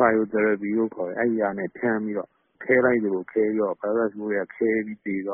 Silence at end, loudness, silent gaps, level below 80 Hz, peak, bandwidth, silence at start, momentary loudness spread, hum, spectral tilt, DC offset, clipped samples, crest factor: 0 s; -24 LUFS; none; -66 dBFS; -6 dBFS; 3.3 kHz; 0 s; 9 LU; none; -1.5 dB/octave; under 0.1%; under 0.1%; 18 dB